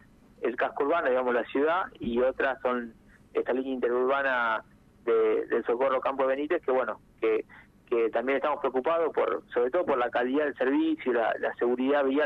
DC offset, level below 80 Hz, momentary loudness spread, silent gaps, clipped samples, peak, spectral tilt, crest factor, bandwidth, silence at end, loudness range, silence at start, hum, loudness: under 0.1%; -62 dBFS; 6 LU; none; under 0.1%; -16 dBFS; -7 dB/octave; 12 dB; 5.2 kHz; 0 s; 1 LU; 0.4 s; 50 Hz at -65 dBFS; -28 LUFS